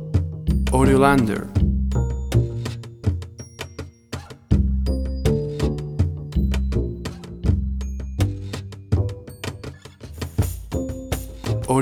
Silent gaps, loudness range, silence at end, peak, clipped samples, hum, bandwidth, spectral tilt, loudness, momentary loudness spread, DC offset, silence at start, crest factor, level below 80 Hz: none; 7 LU; 0 s; -2 dBFS; under 0.1%; none; 16.5 kHz; -7 dB/octave; -23 LUFS; 16 LU; under 0.1%; 0 s; 20 dB; -28 dBFS